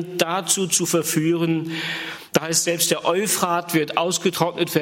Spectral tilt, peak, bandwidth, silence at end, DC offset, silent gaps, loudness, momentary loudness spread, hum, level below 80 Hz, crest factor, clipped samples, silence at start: -3 dB/octave; 0 dBFS; 16.5 kHz; 0 s; under 0.1%; none; -21 LUFS; 5 LU; none; -66 dBFS; 22 dB; under 0.1%; 0 s